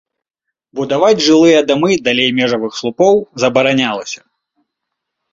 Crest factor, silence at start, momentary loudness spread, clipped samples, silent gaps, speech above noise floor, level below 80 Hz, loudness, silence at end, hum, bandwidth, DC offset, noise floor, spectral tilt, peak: 14 dB; 0.75 s; 14 LU; under 0.1%; none; 66 dB; -54 dBFS; -12 LUFS; 1.15 s; none; 7.8 kHz; under 0.1%; -78 dBFS; -4 dB/octave; 0 dBFS